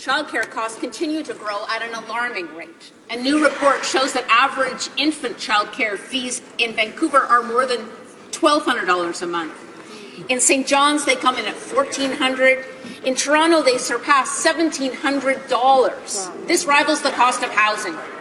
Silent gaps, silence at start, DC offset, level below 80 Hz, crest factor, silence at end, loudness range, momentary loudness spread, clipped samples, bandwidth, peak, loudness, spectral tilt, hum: none; 0 s; under 0.1%; -66 dBFS; 18 dB; 0 s; 3 LU; 11 LU; under 0.1%; 13 kHz; -2 dBFS; -19 LUFS; -1 dB/octave; none